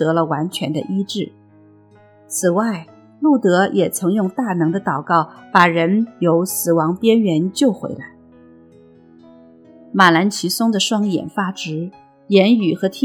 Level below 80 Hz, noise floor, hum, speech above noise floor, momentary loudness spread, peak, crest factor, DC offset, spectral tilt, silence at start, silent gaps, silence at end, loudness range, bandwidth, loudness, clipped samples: -66 dBFS; -48 dBFS; none; 32 dB; 12 LU; 0 dBFS; 18 dB; under 0.1%; -5 dB/octave; 0 s; none; 0 s; 4 LU; 18 kHz; -17 LUFS; under 0.1%